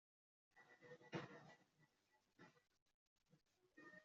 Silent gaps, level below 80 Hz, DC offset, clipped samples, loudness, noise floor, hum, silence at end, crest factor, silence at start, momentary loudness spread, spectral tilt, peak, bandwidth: 2.82-2.86 s, 2.94-3.16 s; under -90 dBFS; under 0.1%; under 0.1%; -59 LUFS; -84 dBFS; none; 0 s; 28 dB; 0.55 s; 13 LU; -4.5 dB/octave; -36 dBFS; 7.4 kHz